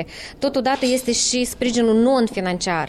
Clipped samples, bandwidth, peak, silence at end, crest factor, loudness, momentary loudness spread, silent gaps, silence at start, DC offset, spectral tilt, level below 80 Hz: under 0.1%; 14.5 kHz; -6 dBFS; 0 s; 12 dB; -19 LUFS; 6 LU; none; 0 s; under 0.1%; -3.5 dB/octave; -46 dBFS